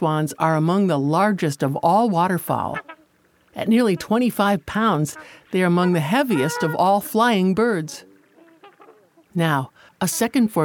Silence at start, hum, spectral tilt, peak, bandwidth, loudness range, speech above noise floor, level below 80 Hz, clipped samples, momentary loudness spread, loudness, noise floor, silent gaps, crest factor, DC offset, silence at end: 0 s; none; -6 dB/octave; -4 dBFS; 19.5 kHz; 3 LU; 40 dB; -58 dBFS; under 0.1%; 10 LU; -20 LUFS; -60 dBFS; none; 16 dB; under 0.1%; 0 s